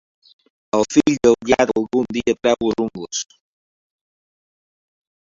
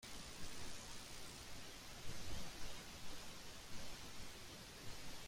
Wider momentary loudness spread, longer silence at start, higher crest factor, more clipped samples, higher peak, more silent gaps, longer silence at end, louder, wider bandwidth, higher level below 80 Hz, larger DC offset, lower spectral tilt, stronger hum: first, 11 LU vs 3 LU; first, 0.75 s vs 0 s; about the same, 20 dB vs 16 dB; neither; first, -2 dBFS vs -32 dBFS; neither; first, 2.1 s vs 0 s; first, -18 LUFS vs -53 LUFS; second, 7.8 kHz vs 16 kHz; first, -52 dBFS vs -60 dBFS; neither; first, -4.5 dB/octave vs -2.5 dB/octave; neither